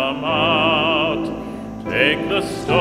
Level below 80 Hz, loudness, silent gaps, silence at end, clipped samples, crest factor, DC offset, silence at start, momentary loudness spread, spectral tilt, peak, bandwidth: -44 dBFS; -18 LUFS; none; 0 s; under 0.1%; 18 dB; under 0.1%; 0 s; 13 LU; -5 dB/octave; 0 dBFS; 15 kHz